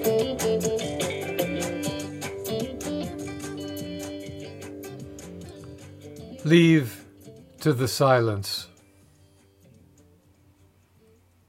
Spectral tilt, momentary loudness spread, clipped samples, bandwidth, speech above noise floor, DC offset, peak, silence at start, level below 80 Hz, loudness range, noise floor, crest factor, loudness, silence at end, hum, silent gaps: -5.5 dB/octave; 22 LU; under 0.1%; 16 kHz; 39 dB; under 0.1%; -6 dBFS; 0 s; -60 dBFS; 12 LU; -59 dBFS; 22 dB; -26 LUFS; 2.8 s; none; none